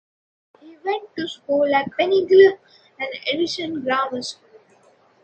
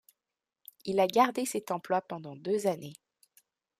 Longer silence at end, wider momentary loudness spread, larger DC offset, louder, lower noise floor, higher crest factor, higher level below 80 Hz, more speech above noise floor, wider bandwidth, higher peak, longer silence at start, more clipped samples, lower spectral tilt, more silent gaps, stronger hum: about the same, 0.9 s vs 0.85 s; about the same, 17 LU vs 16 LU; neither; first, -20 LUFS vs -30 LUFS; second, -56 dBFS vs -90 dBFS; about the same, 20 dB vs 22 dB; first, -68 dBFS vs -80 dBFS; second, 36 dB vs 60 dB; second, 8.8 kHz vs 15.5 kHz; first, -2 dBFS vs -12 dBFS; second, 0.65 s vs 0.85 s; neither; about the same, -4 dB/octave vs -4.5 dB/octave; neither; neither